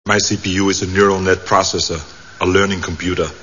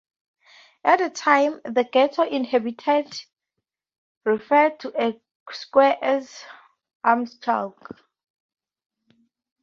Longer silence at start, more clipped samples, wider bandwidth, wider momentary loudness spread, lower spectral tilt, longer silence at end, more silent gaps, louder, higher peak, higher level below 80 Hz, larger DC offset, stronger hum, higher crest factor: second, 0.05 s vs 0.85 s; neither; about the same, 7.4 kHz vs 7.6 kHz; second, 7 LU vs 16 LU; about the same, -3.5 dB/octave vs -4 dB/octave; second, 0 s vs 1.95 s; second, none vs 3.98-4.21 s, 5.35-5.46 s, 6.95-7.00 s; first, -16 LUFS vs -22 LUFS; about the same, 0 dBFS vs -2 dBFS; first, -40 dBFS vs -74 dBFS; first, 0.7% vs under 0.1%; neither; second, 16 dB vs 22 dB